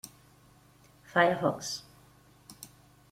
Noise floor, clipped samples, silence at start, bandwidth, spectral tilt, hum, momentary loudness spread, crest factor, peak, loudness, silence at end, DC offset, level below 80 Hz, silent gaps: -60 dBFS; under 0.1%; 0.05 s; 16.5 kHz; -4 dB/octave; 50 Hz at -60 dBFS; 24 LU; 26 dB; -8 dBFS; -29 LUFS; 0.45 s; under 0.1%; -68 dBFS; none